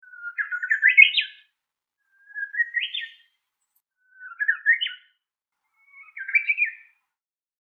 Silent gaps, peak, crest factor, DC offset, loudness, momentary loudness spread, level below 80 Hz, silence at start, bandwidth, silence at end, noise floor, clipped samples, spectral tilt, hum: none; 0 dBFS; 26 dB; under 0.1%; -20 LUFS; 20 LU; under -90 dBFS; 0.2 s; 7.4 kHz; 0.85 s; -90 dBFS; under 0.1%; 8.5 dB/octave; none